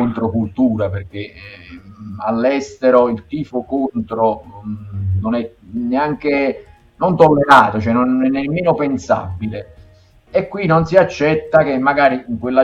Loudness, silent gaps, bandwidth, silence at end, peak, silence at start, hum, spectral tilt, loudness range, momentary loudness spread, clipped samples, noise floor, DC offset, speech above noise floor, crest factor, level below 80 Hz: -16 LUFS; none; 10.5 kHz; 0 s; 0 dBFS; 0 s; none; -7.5 dB/octave; 5 LU; 16 LU; under 0.1%; -47 dBFS; under 0.1%; 31 dB; 16 dB; -46 dBFS